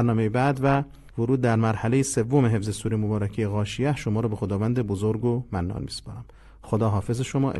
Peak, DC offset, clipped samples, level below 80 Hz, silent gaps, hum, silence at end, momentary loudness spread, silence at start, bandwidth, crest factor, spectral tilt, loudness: -8 dBFS; under 0.1%; under 0.1%; -44 dBFS; none; none; 0 s; 8 LU; 0 s; 12.5 kHz; 16 dB; -6.5 dB/octave; -25 LUFS